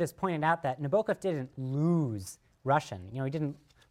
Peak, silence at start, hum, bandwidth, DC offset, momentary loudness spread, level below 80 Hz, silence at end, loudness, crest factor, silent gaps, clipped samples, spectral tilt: -14 dBFS; 0 s; none; 15 kHz; under 0.1%; 12 LU; -66 dBFS; 0.35 s; -32 LUFS; 18 dB; none; under 0.1%; -7 dB/octave